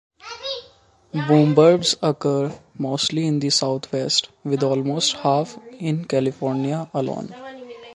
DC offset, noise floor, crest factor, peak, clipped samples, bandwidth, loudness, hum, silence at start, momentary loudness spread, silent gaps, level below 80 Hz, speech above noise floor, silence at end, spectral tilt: under 0.1%; -53 dBFS; 20 dB; -2 dBFS; under 0.1%; 11.5 kHz; -21 LUFS; none; 0.25 s; 16 LU; none; -64 dBFS; 33 dB; 0 s; -5 dB/octave